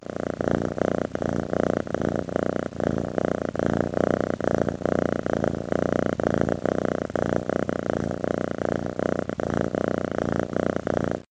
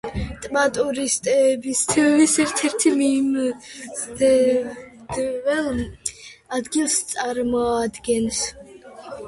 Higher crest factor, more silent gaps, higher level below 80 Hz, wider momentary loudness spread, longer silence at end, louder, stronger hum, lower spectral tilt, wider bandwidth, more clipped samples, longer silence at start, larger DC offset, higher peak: first, 22 dB vs 16 dB; neither; about the same, -48 dBFS vs -44 dBFS; second, 3 LU vs 13 LU; about the same, 0.1 s vs 0 s; second, -26 LUFS vs -21 LUFS; neither; first, -7.5 dB/octave vs -3 dB/octave; second, 9.4 kHz vs 11.5 kHz; neither; about the same, 0.05 s vs 0.05 s; neither; about the same, -4 dBFS vs -6 dBFS